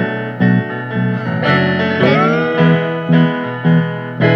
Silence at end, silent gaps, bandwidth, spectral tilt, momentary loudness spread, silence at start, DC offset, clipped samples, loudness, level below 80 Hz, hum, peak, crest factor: 0 s; none; 6 kHz; -8.5 dB/octave; 6 LU; 0 s; under 0.1%; under 0.1%; -14 LUFS; -52 dBFS; none; 0 dBFS; 14 dB